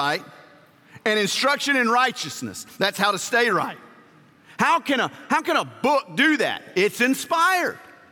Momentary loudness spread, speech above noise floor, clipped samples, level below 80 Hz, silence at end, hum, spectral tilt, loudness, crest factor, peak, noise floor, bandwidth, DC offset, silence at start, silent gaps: 10 LU; 30 dB; under 0.1%; -72 dBFS; 0.3 s; none; -3 dB/octave; -21 LUFS; 18 dB; -4 dBFS; -52 dBFS; 17 kHz; under 0.1%; 0 s; none